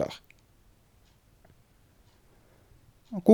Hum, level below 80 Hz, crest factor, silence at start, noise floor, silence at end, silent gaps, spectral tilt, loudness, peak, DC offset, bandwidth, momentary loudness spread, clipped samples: none; -64 dBFS; 26 dB; 0 s; -62 dBFS; 0 s; none; -8 dB/octave; -33 LUFS; -6 dBFS; under 0.1%; 19.5 kHz; 29 LU; under 0.1%